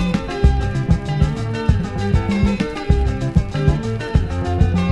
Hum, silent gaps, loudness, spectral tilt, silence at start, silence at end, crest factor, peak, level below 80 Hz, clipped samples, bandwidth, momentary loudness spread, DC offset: none; none; -19 LUFS; -7.5 dB/octave; 0 s; 0 s; 18 dB; 0 dBFS; -22 dBFS; under 0.1%; 10.5 kHz; 3 LU; under 0.1%